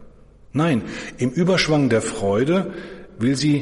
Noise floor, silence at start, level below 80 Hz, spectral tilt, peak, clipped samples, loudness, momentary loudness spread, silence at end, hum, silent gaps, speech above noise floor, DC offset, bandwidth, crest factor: -46 dBFS; 0 s; -48 dBFS; -5.5 dB/octave; -6 dBFS; under 0.1%; -20 LUFS; 13 LU; 0 s; none; none; 27 dB; under 0.1%; 11.5 kHz; 14 dB